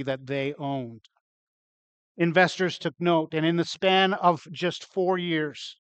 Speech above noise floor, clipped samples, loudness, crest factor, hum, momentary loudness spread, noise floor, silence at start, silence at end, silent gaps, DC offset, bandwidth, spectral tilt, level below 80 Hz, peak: over 65 dB; under 0.1%; -25 LUFS; 22 dB; none; 11 LU; under -90 dBFS; 0 s; 0.2 s; 1.21-2.15 s; under 0.1%; 8.6 kHz; -5.5 dB/octave; -74 dBFS; -6 dBFS